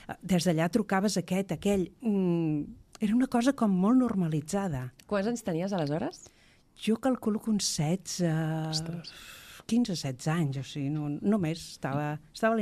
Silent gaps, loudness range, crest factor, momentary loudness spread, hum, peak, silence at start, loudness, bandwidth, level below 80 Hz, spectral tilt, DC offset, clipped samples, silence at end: none; 4 LU; 18 dB; 9 LU; none; -12 dBFS; 0.1 s; -30 LUFS; 14.5 kHz; -58 dBFS; -5.5 dB/octave; under 0.1%; under 0.1%; 0 s